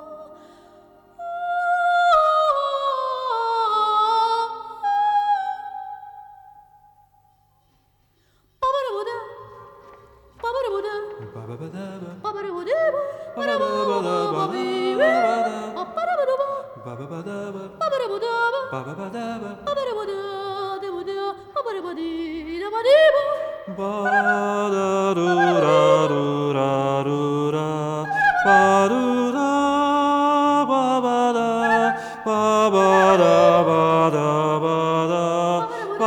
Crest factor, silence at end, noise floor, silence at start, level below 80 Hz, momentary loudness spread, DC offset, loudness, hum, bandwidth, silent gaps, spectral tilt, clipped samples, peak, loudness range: 18 dB; 0 s; -63 dBFS; 0 s; -60 dBFS; 16 LU; under 0.1%; -20 LUFS; none; 18 kHz; none; -5.5 dB/octave; under 0.1%; -4 dBFS; 12 LU